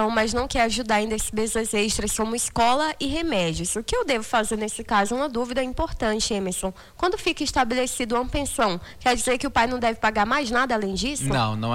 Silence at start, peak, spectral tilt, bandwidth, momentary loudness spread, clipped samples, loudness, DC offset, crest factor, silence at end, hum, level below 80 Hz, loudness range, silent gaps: 0 s; -8 dBFS; -3.5 dB/octave; 16.5 kHz; 5 LU; under 0.1%; -24 LUFS; under 0.1%; 14 dB; 0 s; none; -40 dBFS; 2 LU; none